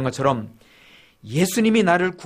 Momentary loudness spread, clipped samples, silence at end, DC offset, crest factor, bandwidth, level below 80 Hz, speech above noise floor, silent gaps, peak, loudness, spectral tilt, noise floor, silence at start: 11 LU; under 0.1%; 0 s; under 0.1%; 18 dB; 15.5 kHz; -56 dBFS; 31 dB; none; -4 dBFS; -20 LUFS; -5 dB/octave; -51 dBFS; 0 s